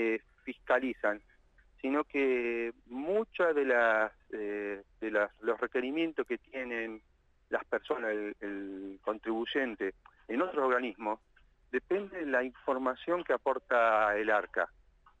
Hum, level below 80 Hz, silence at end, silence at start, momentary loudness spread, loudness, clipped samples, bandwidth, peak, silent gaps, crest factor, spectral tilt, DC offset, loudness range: none; -66 dBFS; 0.5 s; 0 s; 12 LU; -33 LUFS; under 0.1%; 8.2 kHz; -16 dBFS; none; 18 dB; -5.5 dB/octave; under 0.1%; 5 LU